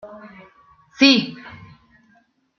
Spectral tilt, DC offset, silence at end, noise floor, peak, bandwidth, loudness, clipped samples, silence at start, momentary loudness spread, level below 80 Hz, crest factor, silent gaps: -3.5 dB/octave; under 0.1%; 1.1 s; -60 dBFS; 0 dBFS; 6.8 kHz; -15 LUFS; under 0.1%; 0.05 s; 27 LU; -64 dBFS; 22 dB; none